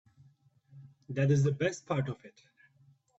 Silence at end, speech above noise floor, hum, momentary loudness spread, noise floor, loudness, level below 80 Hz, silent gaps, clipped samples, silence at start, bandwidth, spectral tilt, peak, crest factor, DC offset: 0.9 s; 35 dB; none; 12 LU; -65 dBFS; -31 LUFS; -68 dBFS; none; under 0.1%; 0.75 s; 8 kHz; -7 dB/octave; -16 dBFS; 18 dB; under 0.1%